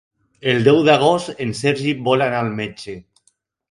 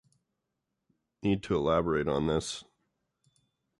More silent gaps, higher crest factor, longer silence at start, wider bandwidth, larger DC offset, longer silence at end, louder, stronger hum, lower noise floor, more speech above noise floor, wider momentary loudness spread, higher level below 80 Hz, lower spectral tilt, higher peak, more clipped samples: neither; about the same, 18 dB vs 18 dB; second, 0.45 s vs 1.25 s; about the same, 11.5 kHz vs 11.5 kHz; neither; second, 0.7 s vs 1.15 s; first, -17 LUFS vs -30 LUFS; neither; second, -64 dBFS vs -84 dBFS; second, 46 dB vs 55 dB; first, 16 LU vs 9 LU; about the same, -56 dBFS vs -52 dBFS; about the same, -5.5 dB/octave vs -6 dB/octave; first, 0 dBFS vs -16 dBFS; neither